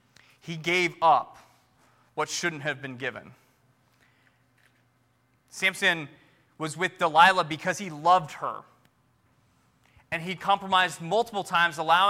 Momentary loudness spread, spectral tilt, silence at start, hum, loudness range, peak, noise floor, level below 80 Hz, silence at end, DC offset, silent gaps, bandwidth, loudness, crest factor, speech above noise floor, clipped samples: 16 LU; -3 dB/octave; 0.45 s; none; 10 LU; -4 dBFS; -67 dBFS; -72 dBFS; 0 s; under 0.1%; none; 16.5 kHz; -25 LUFS; 24 dB; 42 dB; under 0.1%